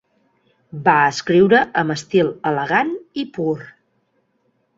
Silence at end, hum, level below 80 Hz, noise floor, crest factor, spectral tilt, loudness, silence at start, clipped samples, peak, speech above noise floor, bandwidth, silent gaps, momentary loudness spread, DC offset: 1.1 s; none; -58 dBFS; -66 dBFS; 18 dB; -5.5 dB/octave; -18 LUFS; 0.75 s; under 0.1%; -2 dBFS; 48 dB; 7.8 kHz; none; 13 LU; under 0.1%